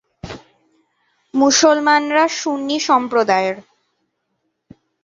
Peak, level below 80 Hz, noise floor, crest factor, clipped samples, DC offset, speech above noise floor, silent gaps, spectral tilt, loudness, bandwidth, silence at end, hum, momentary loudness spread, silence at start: -2 dBFS; -56 dBFS; -71 dBFS; 16 dB; under 0.1%; under 0.1%; 56 dB; none; -2 dB/octave; -16 LUFS; 7.8 kHz; 1.4 s; none; 22 LU; 0.25 s